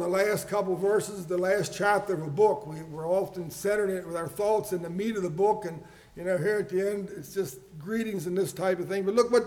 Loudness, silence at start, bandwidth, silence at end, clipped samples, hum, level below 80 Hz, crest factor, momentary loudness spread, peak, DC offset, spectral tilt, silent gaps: -28 LUFS; 0 s; 18.5 kHz; 0 s; under 0.1%; none; -62 dBFS; 18 dB; 10 LU; -10 dBFS; under 0.1%; -5.5 dB/octave; none